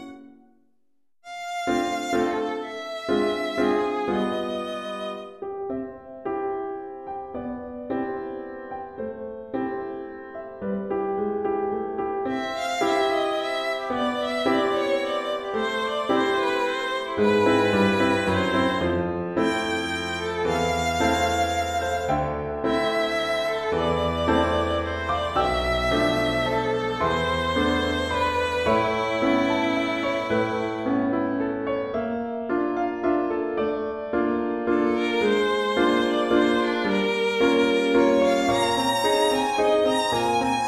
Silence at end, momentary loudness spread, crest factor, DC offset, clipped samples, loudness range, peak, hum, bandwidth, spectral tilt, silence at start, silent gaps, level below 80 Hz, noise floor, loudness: 0 s; 12 LU; 16 dB; under 0.1%; under 0.1%; 10 LU; -8 dBFS; none; 14 kHz; -5 dB/octave; 0 s; none; -46 dBFS; -77 dBFS; -24 LUFS